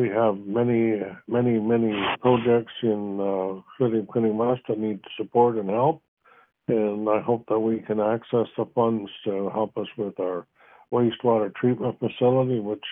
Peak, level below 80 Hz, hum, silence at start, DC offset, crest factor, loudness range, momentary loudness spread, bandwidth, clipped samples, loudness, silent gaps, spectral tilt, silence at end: -6 dBFS; -66 dBFS; none; 0 s; under 0.1%; 18 dB; 3 LU; 8 LU; 3.8 kHz; under 0.1%; -24 LUFS; 6.08-6.17 s; -11 dB/octave; 0 s